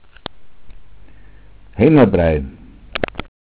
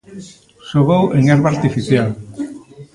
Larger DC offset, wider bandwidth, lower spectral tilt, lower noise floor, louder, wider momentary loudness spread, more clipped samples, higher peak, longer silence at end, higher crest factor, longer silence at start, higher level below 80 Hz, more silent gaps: neither; second, 4 kHz vs 11 kHz; first, -11.5 dB/octave vs -7.5 dB/octave; first, -44 dBFS vs -34 dBFS; about the same, -15 LUFS vs -15 LUFS; first, 23 LU vs 16 LU; neither; about the same, 0 dBFS vs 0 dBFS; first, 0.25 s vs 0.1 s; about the same, 18 dB vs 16 dB; first, 0.35 s vs 0.1 s; first, -34 dBFS vs -46 dBFS; neither